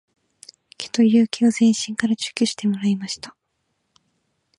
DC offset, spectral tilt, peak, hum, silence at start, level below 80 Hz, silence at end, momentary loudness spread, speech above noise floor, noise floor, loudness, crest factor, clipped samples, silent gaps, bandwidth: under 0.1%; -4.5 dB/octave; -4 dBFS; none; 0.8 s; -68 dBFS; 1.3 s; 14 LU; 54 dB; -73 dBFS; -20 LUFS; 18 dB; under 0.1%; none; 11 kHz